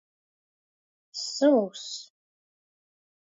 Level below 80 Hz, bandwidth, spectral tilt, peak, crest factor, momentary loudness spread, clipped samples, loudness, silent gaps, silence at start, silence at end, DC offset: under -90 dBFS; 7.8 kHz; -3.5 dB/octave; -10 dBFS; 22 dB; 17 LU; under 0.1%; -26 LUFS; none; 1.15 s; 1.3 s; under 0.1%